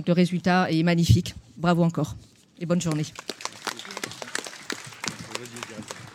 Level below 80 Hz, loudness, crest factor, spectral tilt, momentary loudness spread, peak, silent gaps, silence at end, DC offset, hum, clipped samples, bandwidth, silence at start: -46 dBFS; -26 LUFS; 22 dB; -5.5 dB/octave; 15 LU; -4 dBFS; none; 0 s; under 0.1%; none; under 0.1%; 15 kHz; 0 s